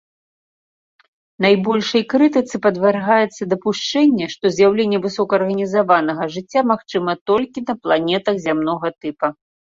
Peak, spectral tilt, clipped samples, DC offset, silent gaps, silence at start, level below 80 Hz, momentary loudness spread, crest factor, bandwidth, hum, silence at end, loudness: -2 dBFS; -5.5 dB/octave; under 0.1%; under 0.1%; 7.21-7.26 s; 1.4 s; -60 dBFS; 8 LU; 16 dB; 7.8 kHz; none; 0.4 s; -18 LUFS